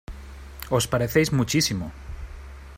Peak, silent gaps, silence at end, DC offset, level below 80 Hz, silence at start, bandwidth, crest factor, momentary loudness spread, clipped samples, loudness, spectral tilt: -6 dBFS; none; 0 s; under 0.1%; -40 dBFS; 0.1 s; 16 kHz; 20 dB; 20 LU; under 0.1%; -23 LUFS; -4.5 dB/octave